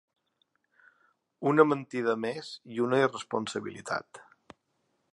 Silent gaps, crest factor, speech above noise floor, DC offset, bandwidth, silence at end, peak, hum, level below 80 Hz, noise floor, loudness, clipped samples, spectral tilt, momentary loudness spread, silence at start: none; 26 dB; 48 dB; under 0.1%; 11 kHz; 0.95 s; -6 dBFS; none; -78 dBFS; -76 dBFS; -29 LUFS; under 0.1%; -5.5 dB/octave; 12 LU; 1.4 s